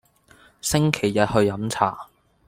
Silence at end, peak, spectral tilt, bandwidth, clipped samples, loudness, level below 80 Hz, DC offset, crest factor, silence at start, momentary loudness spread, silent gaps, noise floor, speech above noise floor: 0.45 s; -2 dBFS; -5 dB/octave; 16.5 kHz; under 0.1%; -22 LUFS; -48 dBFS; under 0.1%; 22 dB; 0.65 s; 7 LU; none; -54 dBFS; 33 dB